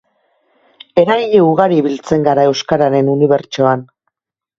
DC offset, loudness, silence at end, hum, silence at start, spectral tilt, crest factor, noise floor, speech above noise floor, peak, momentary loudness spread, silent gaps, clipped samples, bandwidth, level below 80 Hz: under 0.1%; -13 LUFS; 0.75 s; none; 0.95 s; -6.5 dB/octave; 14 dB; -79 dBFS; 67 dB; 0 dBFS; 5 LU; none; under 0.1%; 7.6 kHz; -54 dBFS